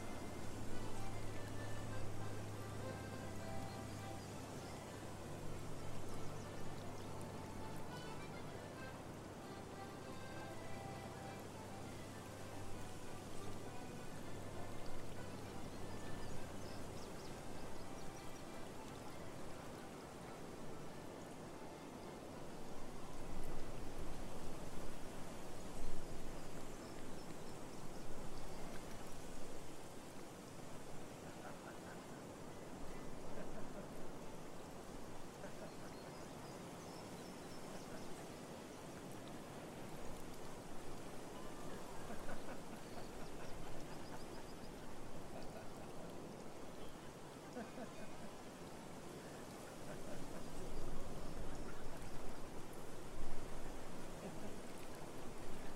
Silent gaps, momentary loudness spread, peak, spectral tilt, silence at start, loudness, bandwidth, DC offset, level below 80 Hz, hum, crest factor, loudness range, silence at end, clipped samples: none; 4 LU; -26 dBFS; -5 dB/octave; 0 s; -52 LUFS; 15 kHz; under 0.1%; -54 dBFS; none; 18 dB; 3 LU; 0 s; under 0.1%